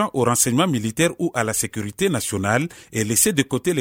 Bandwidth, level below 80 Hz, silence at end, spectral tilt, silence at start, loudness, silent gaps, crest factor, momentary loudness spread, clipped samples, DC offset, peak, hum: 19.5 kHz; -54 dBFS; 0 s; -4 dB/octave; 0 s; -20 LUFS; none; 18 dB; 6 LU; under 0.1%; under 0.1%; -2 dBFS; none